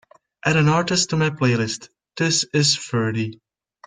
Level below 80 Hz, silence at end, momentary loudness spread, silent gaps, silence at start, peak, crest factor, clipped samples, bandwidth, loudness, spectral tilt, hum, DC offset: -58 dBFS; 0.5 s; 10 LU; none; 0.45 s; -4 dBFS; 18 dB; under 0.1%; 9.6 kHz; -20 LUFS; -4 dB/octave; none; under 0.1%